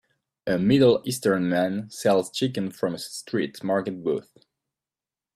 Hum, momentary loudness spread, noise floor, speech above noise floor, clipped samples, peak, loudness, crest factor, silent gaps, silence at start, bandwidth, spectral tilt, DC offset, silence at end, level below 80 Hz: none; 11 LU; under -90 dBFS; over 66 dB; under 0.1%; -6 dBFS; -24 LUFS; 18 dB; none; 0.45 s; 15 kHz; -5.5 dB/octave; under 0.1%; 1.15 s; -62 dBFS